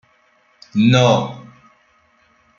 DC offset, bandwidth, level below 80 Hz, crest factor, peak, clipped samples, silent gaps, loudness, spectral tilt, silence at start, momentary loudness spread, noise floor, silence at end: under 0.1%; 7.4 kHz; -56 dBFS; 18 dB; -2 dBFS; under 0.1%; none; -15 LUFS; -6 dB/octave; 0.75 s; 18 LU; -57 dBFS; 1.15 s